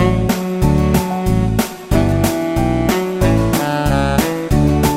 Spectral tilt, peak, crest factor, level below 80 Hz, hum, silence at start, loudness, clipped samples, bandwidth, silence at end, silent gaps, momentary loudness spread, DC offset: -6.5 dB/octave; 0 dBFS; 14 dB; -24 dBFS; none; 0 s; -16 LUFS; under 0.1%; 16.5 kHz; 0 s; none; 3 LU; under 0.1%